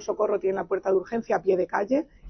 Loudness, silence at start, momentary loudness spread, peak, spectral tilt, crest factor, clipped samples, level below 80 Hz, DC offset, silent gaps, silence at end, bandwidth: -26 LUFS; 0 s; 3 LU; -10 dBFS; -6.5 dB/octave; 14 dB; under 0.1%; -60 dBFS; under 0.1%; none; 0 s; 6.4 kHz